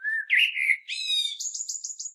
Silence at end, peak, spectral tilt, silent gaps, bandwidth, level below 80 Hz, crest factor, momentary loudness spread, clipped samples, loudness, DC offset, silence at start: 0 s; -10 dBFS; 11.5 dB/octave; none; 14.5 kHz; under -90 dBFS; 18 dB; 10 LU; under 0.1%; -24 LUFS; under 0.1%; 0 s